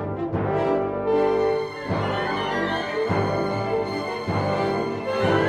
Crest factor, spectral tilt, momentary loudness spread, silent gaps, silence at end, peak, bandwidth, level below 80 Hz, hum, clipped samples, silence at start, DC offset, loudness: 16 dB; -7 dB/octave; 5 LU; none; 0 s; -8 dBFS; 11.5 kHz; -50 dBFS; 50 Hz at -40 dBFS; under 0.1%; 0 s; under 0.1%; -24 LUFS